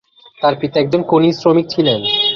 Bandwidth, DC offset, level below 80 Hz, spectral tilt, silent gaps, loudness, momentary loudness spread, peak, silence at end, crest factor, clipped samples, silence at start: 7 kHz; under 0.1%; -54 dBFS; -6.5 dB/octave; none; -14 LUFS; 5 LU; -2 dBFS; 0 s; 14 dB; under 0.1%; 0.4 s